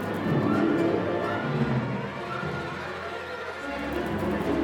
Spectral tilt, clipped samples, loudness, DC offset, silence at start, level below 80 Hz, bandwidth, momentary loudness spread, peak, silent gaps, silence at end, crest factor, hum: -7.5 dB/octave; under 0.1%; -28 LUFS; under 0.1%; 0 s; -50 dBFS; 18.5 kHz; 10 LU; -12 dBFS; none; 0 s; 16 dB; none